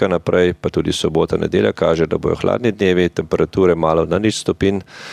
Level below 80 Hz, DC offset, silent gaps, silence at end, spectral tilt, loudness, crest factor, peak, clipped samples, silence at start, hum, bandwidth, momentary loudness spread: -40 dBFS; under 0.1%; none; 0 s; -6 dB/octave; -17 LUFS; 16 dB; -2 dBFS; under 0.1%; 0 s; none; 12.5 kHz; 4 LU